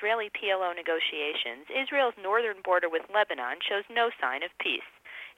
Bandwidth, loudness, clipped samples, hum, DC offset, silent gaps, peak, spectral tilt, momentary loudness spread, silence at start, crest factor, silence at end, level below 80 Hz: 16 kHz; -29 LUFS; under 0.1%; none; under 0.1%; none; -12 dBFS; -2.5 dB/octave; 5 LU; 0 s; 18 dB; 0.05 s; -78 dBFS